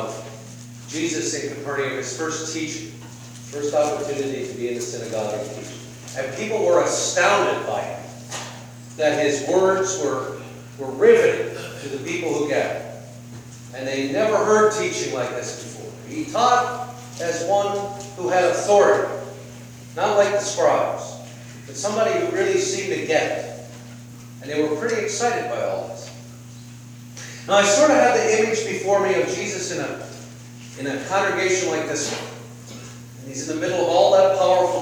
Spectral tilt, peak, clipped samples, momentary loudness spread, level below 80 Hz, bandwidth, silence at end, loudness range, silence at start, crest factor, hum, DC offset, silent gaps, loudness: -3.5 dB/octave; -4 dBFS; under 0.1%; 22 LU; -62 dBFS; over 20 kHz; 0 s; 6 LU; 0 s; 20 dB; none; under 0.1%; none; -21 LUFS